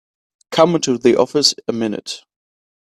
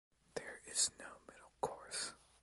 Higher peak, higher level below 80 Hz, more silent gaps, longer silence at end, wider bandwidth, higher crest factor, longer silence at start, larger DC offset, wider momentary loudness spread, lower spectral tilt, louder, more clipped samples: first, 0 dBFS vs -22 dBFS; first, -60 dBFS vs -74 dBFS; neither; first, 0.65 s vs 0.25 s; first, 13.5 kHz vs 12 kHz; second, 18 dB vs 24 dB; first, 0.5 s vs 0.35 s; neither; second, 13 LU vs 19 LU; first, -4 dB/octave vs 0 dB/octave; first, -16 LUFS vs -41 LUFS; neither